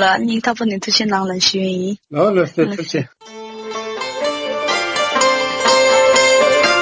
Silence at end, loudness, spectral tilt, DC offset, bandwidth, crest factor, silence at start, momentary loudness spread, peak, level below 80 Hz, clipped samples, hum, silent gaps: 0 s; -15 LUFS; -3 dB/octave; under 0.1%; 8 kHz; 14 dB; 0 s; 14 LU; -2 dBFS; -56 dBFS; under 0.1%; none; none